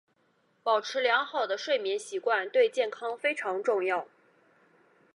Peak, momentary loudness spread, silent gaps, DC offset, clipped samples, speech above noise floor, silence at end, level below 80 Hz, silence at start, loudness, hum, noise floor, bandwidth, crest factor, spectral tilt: -12 dBFS; 6 LU; none; under 0.1%; under 0.1%; 42 dB; 1.1 s; under -90 dBFS; 0.65 s; -29 LUFS; none; -70 dBFS; 11.5 kHz; 18 dB; -2 dB/octave